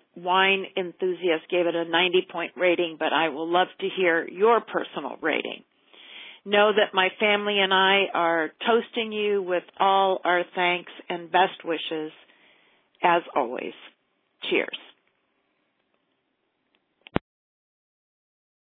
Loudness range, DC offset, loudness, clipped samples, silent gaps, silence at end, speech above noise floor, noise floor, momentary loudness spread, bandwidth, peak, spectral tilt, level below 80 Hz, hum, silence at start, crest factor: 12 LU; under 0.1%; -24 LUFS; under 0.1%; none; 1.6 s; 51 dB; -74 dBFS; 13 LU; 4 kHz; -2 dBFS; -7.5 dB/octave; -66 dBFS; none; 0.15 s; 24 dB